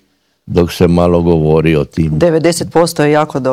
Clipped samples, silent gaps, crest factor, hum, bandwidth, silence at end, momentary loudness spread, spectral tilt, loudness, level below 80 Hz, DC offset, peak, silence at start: 0.9%; none; 12 dB; none; 15.5 kHz; 0 s; 4 LU; -6.5 dB/octave; -12 LUFS; -36 dBFS; under 0.1%; 0 dBFS; 0.45 s